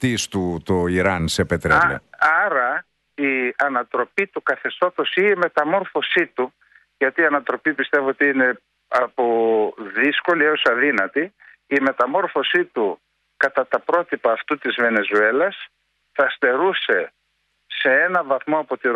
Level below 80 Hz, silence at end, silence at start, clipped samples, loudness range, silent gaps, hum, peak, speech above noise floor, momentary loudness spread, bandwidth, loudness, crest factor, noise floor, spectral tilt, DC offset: -50 dBFS; 0 s; 0 s; under 0.1%; 2 LU; none; none; -6 dBFS; 50 dB; 7 LU; 12 kHz; -19 LUFS; 14 dB; -69 dBFS; -4.5 dB/octave; under 0.1%